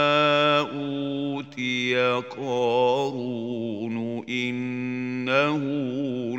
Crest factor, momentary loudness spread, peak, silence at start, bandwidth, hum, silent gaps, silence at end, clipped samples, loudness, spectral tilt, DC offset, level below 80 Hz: 18 dB; 10 LU; -6 dBFS; 0 s; 8.6 kHz; none; none; 0 s; under 0.1%; -25 LUFS; -5.5 dB/octave; under 0.1%; -74 dBFS